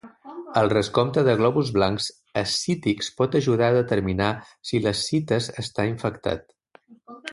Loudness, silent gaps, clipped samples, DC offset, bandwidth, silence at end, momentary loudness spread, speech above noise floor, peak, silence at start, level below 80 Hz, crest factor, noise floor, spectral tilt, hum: -23 LUFS; none; under 0.1%; under 0.1%; 11.5 kHz; 0 s; 9 LU; 31 dB; -4 dBFS; 0.05 s; -50 dBFS; 18 dB; -54 dBFS; -5.5 dB/octave; none